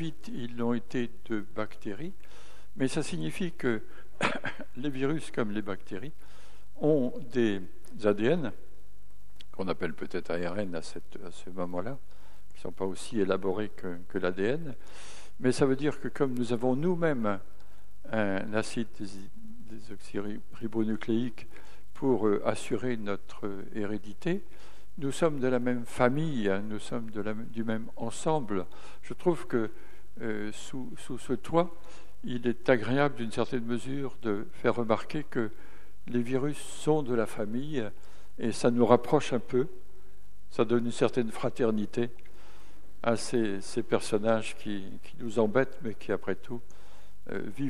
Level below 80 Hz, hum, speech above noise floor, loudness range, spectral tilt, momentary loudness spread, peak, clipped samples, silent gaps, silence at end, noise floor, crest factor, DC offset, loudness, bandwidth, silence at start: -58 dBFS; none; 27 dB; 6 LU; -6 dB/octave; 14 LU; -6 dBFS; under 0.1%; none; 0 s; -58 dBFS; 26 dB; 3%; -32 LUFS; 14.5 kHz; 0 s